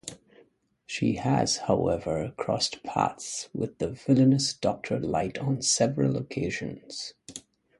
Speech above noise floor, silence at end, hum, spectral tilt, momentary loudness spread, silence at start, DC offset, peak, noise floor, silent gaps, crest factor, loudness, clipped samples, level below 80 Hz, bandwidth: 35 dB; 0.4 s; none; -4.5 dB/octave; 14 LU; 0.05 s; under 0.1%; -8 dBFS; -63 dBFS; none; 20 dB; -27 LUFS; under 0.1%; -54 dBFS; 11.5 kHz